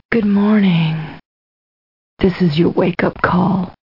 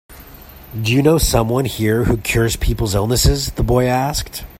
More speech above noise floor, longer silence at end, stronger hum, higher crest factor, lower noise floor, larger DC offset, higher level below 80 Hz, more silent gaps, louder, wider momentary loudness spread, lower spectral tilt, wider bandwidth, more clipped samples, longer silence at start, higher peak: first, over 76 dB vs 23 dB; about the same, 0.15 s vs 0.05 s; neither; about the same, 16 dB vs 16 dB; first, under -90 dBFS vs -39 dBFS; first, 0.3% vs under 0.1%; second, -42 dBFS vs -26 dBFS; first, 1.25-2.17 s vs none; about the same, -15 LUFS vs -17 LUFS; about the same, 6 LU vs 6 LU; first, -9.5 dB/octave vs -5 dB/octave; second, 5.8 kHz vs 16.5 kHz; neither; about the same, 0.1 s vs 0.1 s; about the same, 0 dBFS vs 0 dBFS